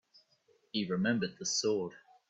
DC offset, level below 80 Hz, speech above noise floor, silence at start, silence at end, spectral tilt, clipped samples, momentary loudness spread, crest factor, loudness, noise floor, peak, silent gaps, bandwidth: under 0.1%; -76 dBFS; 38 dB; 0.75 s; 0.3 s; -3.5 dB/octave; under 0.1%; 7 LU; 16 dB; -34 LUFS; -71 dBFS; -18 dBFS; none; 8.4 kHz